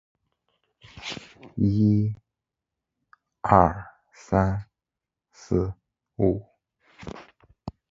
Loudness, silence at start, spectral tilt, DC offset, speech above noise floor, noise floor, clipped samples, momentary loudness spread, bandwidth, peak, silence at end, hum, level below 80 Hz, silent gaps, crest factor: -24 LUFS; 0.95 s; -8 dB/octave; under 0.1%; 66 dB; -88 dBFS; under 0.1%; 23 LU; 7.6 kHz; 0 dBFS; 0.2 s; none; -44 dBFS; none; 26 dB